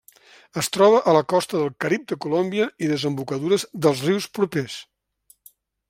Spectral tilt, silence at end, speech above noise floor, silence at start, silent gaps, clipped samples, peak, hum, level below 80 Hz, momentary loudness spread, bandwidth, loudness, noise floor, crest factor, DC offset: -5 dB/octave; 1.05 s; 38 dB; 0.55 s; none; under 0.1%; -4 dBFS; none; -66 dBFS; 10 LU; 16.5 kHz; -21 LUFS; -59 dBFS; 20 dB; under 0.1%